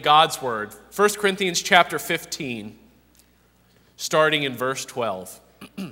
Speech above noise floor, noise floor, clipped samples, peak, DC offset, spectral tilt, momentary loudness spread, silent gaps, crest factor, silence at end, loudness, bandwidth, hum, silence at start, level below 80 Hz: 37 dB; -59 dBFS; under 0.1%; 0 dBFS; under 0.1%; -2.5 dB/octave; 18 LU; none; 24 dB; 0 s; -22 LUFS; 16 kHz; 60 Hz at -55 dBFS; 0 s; -62 dBFS